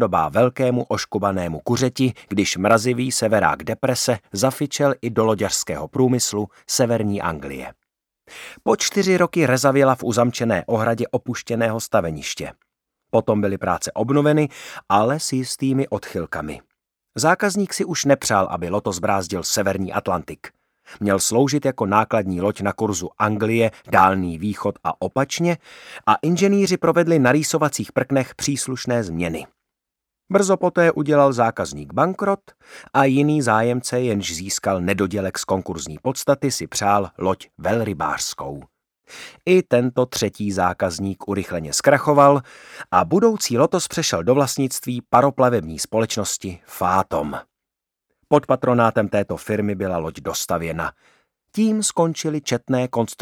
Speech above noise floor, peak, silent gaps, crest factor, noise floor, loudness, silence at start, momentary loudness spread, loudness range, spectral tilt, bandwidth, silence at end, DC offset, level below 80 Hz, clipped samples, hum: 65 dB; 0 dBFS; none; 20 dB; -85 dBFS; -20 LUFS; 0 s; 10 LU; 4 LU; -4.5 dB/octave; 19 kHz; 0.05 s; under 0.1%; -52 dBFS; under 0.1%; none